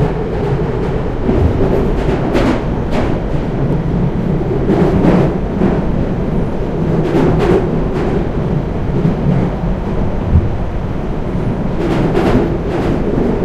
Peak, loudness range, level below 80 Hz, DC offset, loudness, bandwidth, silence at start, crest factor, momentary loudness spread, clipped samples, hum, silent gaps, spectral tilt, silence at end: 0 dBFS; 2 LU; -22 dBFS; under 0.1%; -15 LUFS; 10 kHz; 0 s; 14 dB; 6 LU; under 0.1%; none; none; -9 dB/octave; 0 s